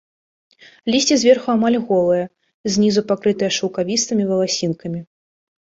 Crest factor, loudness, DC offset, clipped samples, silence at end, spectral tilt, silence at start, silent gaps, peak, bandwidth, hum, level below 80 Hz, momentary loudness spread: 18 dB; -18 LUFS; under 0.1%; under 0.1%; 0.6 s; -4 dB/octave; 0.85 s; 2.54-2.64 s; -2 dBFS; 8 kHz; none; -60 dBFS; 14 LU